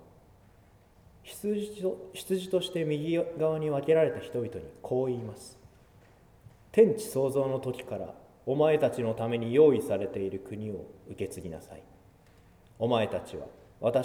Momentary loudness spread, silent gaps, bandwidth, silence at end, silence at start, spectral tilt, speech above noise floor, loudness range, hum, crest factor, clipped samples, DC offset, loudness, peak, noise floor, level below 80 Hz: 19 LU; none; 16 kHz; 0 s; 1.25 s; -6.5 dB/octave; 30 dB; 8 LU; none; 20 dB; under 0.1%; under 0.1%; -29 LUFS; -10 dBFS; -59 dBFS; -62 dBFS